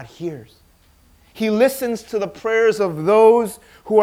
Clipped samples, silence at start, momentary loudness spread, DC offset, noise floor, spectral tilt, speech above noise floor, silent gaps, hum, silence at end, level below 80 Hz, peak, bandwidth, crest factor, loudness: under 0.1%; 0 s; 18 LU; under 0.1%; -53 dBFS; -5.5 dB/octave; 36 dB; none; none; 0 s; -56 dBFS; -2 dBFS; 16 kHz; 18 dB; -17 LUFS